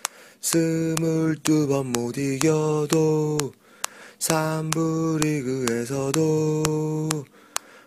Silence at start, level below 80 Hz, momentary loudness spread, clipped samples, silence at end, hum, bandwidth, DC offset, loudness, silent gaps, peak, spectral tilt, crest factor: 0.05 s; -58 dBFS; 11 LU; under 0.1%; 0.1 s; none; 15.5 kHz; under 0.1%; -24 LUFS; none; 0 dBFS; -5 dB/octave; 24 dB